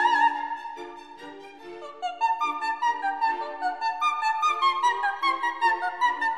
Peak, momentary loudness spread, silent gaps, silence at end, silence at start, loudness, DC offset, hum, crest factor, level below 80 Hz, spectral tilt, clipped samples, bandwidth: -10 dBFS; 19 LU; none; 0 s; 0 s; -25 LUFS; 0.2%; none; 16 dB; -72 dBFS; -0.5 dB/octave; under 0.1%; 10.5 kHz